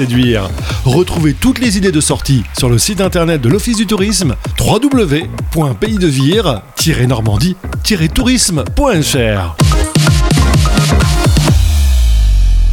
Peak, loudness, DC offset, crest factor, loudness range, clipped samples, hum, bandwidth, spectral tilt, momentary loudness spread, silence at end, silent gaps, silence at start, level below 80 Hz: 0 dBFS; -12 LUFS; under 0.1%; 10 dB; 2 LU; under 0.1%; none; 18 kHz; -5 dB/octave; 4 LU; 0 s; none; 0 s; -16 dBFS